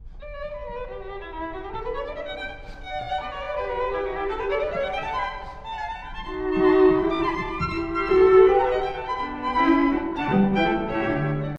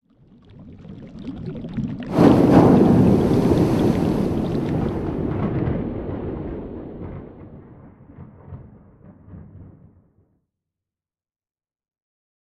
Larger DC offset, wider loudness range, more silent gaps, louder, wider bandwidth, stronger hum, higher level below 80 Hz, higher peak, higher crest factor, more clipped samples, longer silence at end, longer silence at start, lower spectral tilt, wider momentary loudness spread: neither; second, 11 LU vs 20 LU; neither; second, -23 LUFS vs -19 LUFS; second, 7 kHz vs 13.5 kHz; neither; about the same, -40 dBFS vs -40 dBFS; about the same, -4 dBFS vs -2 dBFS; about the same, 18 dB vs 20 dB; neither; second, 0 s vs 2.85 s; second, 0 s vs 0.6 s; about the same, -8 dB/octave vs -9 dB/octave; second, 17 LU vs 26 LU